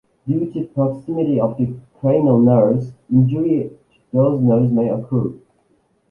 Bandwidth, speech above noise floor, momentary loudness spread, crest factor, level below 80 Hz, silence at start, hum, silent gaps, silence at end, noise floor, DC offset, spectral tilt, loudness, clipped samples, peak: 3.1 kHz; 44 dB; 10 LU; 16 dB; -52 dBFS; 0.25 s; none; none; 0.75 s; -61 dBFS; under 0.1%; -12.5 dB/octave; -18 LUFS; under 0.1%; -2 dBFS